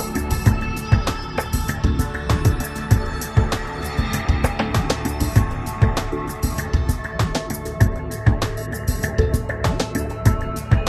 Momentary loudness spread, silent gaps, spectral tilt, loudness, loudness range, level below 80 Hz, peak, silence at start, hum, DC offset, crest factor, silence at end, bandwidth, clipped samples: 6 LU; none; -6 dB/octave; -22 LUFS; 1 LU; -26 dBFS; -2 dBFS; 0 s; none; under 0.1%; 18 dB; 0 s; 14 kHz; under 0.1%